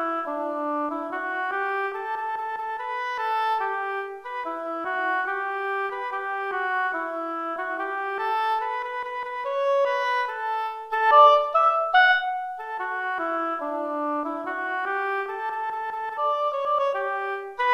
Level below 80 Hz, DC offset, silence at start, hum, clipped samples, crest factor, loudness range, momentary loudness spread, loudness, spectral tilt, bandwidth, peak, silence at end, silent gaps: -74 dBFS; under 0.1%; 0 s; none; under 0.1%; 20 dB; 8 LU; 11 LU; -25 LUFS; -2.5 dB/octave; 14 kHz; -4 dBFS; 0 s; none